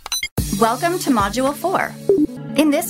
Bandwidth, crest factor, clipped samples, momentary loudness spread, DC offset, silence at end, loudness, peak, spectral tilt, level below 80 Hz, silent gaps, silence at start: 16.5 kHz; 16 dB; under 0.1%; 4 LU; under 0.1%; 0 s; -19 LUFS; -2 dBFS; -4.5 dB/octave; -38 dBFS; 0.31-0.36 s; 0.05 s